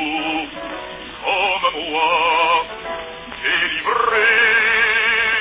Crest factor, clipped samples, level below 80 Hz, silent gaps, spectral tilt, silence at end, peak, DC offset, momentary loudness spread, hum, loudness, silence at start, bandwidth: 14 dB; under 0.1%; -50 dBFS; none; -5.5 dB/octave; 0 s; -4 dBFS; under 0.1%; 16 LU; none; -16 LUFS; 0 s; 4 kHz